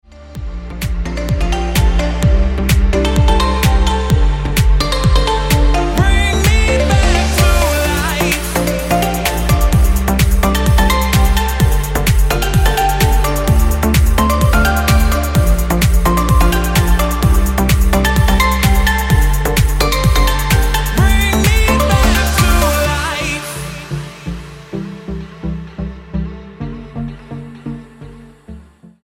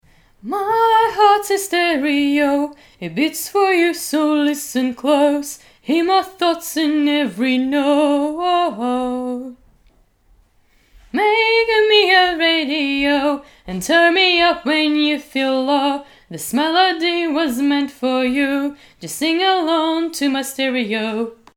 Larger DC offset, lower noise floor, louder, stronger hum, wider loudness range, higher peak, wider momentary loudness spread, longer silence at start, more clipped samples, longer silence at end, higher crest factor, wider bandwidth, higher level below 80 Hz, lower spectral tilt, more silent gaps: neither; second, -38 dBFS vs -56 dBFS; first, -14 LUFS vs -17 LUFS; neither; first, 12 LU vs 4 LU; about the same, 0 dBFS vs 0 dBFS; about the same, 14 LU vs 13 LU; second, 0.15 s vs 0.45 s; neither; first, 0.4 s vs 0.2 s; about the same, 12 dB vs 16 dB; about the same, 17 kHz vs 18.5 kHz; first, -16 dBFS vs -54 dBFS; first, -5 dB/octave vs -3 dB/octave; neither